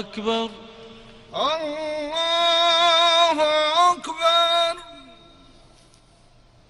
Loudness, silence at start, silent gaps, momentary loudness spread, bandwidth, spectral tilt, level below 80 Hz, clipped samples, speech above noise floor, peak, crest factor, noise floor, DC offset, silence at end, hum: -19 LUFS; 0 s; none; 12 LU; 12 kHz; -1.5 dB/octave; -56 dBFS; under 0.1%; 28 dB; -6 dBFS; 16 dB; -53 dBFS; under 0.1%; 1.7 s; none